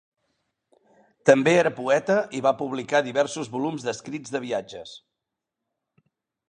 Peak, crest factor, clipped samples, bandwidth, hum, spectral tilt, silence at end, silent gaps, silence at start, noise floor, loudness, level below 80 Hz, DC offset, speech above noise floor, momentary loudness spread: -2 dBFS; 24 dB; under 0.1%; 10 kHz; none; -5 dB/octave; 1.5 s; none; 1.25 s; -85 dBFS; -24 LUFS; -70 dBFS; under 0.1%; 61 dB; 13 LU